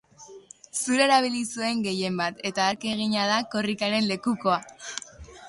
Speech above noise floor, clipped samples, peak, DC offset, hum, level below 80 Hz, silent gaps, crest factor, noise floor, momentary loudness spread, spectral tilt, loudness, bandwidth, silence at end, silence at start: 23 dB; under 0.1%; -8 dBFS; under 0.1%; none; -60 dBFS; none; 20 dB; -48 dBFS; 15 LU; -3.5 dB/octave; -25 LUFS; 11.5 kHz; 0 s; 0.2 s